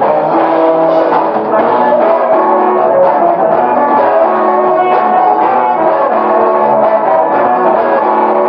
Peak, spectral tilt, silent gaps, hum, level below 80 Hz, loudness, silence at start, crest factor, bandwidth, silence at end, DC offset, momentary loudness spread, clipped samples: 0 dBFS; -9 dB/octave; none; none; -58 dBFS; -9 LUFS; 0 s; 10 dB; 5.4 kHz; 0 s; under 0.1%; 1 LU; under 0.1%